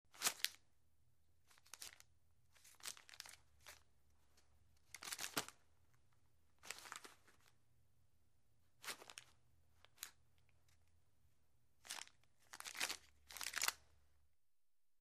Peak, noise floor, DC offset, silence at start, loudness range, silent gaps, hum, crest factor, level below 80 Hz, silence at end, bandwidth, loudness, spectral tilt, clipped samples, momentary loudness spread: -16 dBFS; under -90 dBFS; under 0.1%; 0.15 s; 11 LU; none; none; 38 dB; -82 dBFS; 1.3 s; 15.5 kHz; -48 LUFS; 0.5 dB/octave; under 0.1%; 21 LU